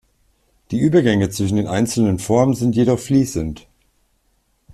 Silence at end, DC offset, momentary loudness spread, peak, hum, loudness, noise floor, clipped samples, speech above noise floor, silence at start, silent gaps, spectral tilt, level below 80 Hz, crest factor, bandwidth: 1.15 s; under 0.1%; 10 LU; -4 dBFS; none; -18 LUFS; -64 dBFS; under 0.1%; 47 dB; 0.7 s; none; -6.5 dB/octave; -44 dBFS; 16 dB; 14 kHz